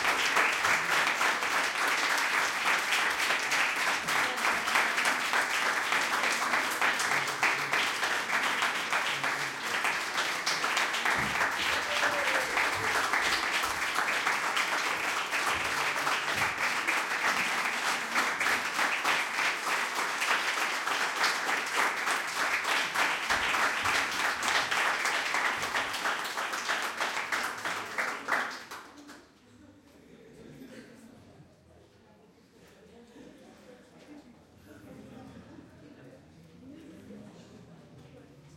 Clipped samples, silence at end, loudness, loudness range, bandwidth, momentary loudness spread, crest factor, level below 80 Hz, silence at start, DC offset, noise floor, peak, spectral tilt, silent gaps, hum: under 0.1%; 0.05 s; -28 LUFS; 5 LU; 17 kHz; 5 LU; 20 dB; -66 dBFS; 0 s; under 0.1%; -59 dBFS; -10 dBFS; -0.5 dB/octave; none; none